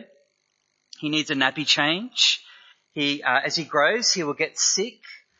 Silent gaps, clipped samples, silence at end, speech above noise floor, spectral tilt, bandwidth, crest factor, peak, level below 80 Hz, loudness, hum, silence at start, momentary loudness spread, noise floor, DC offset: none; under 0.1%; 0.25 s; 49 dB; -1.5 dB/octave; 8.2 kHz; 22 dB; -4 dBFS; -80 dBFS; -21 LUFS; none; 0 s; 7 LU; -72 dBFS; under 0.1%